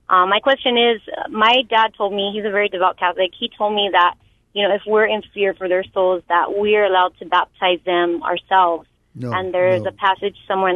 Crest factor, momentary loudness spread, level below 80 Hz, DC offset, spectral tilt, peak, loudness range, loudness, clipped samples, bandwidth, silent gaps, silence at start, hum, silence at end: 16 dB; 7 LU; -58 dBFS; under 0.1%; -6 dB/octave; -2 dBFS; 2 LU; -18 LUFS; under 0.1%; 7 kHz; none; 0.1 s; none; 0 s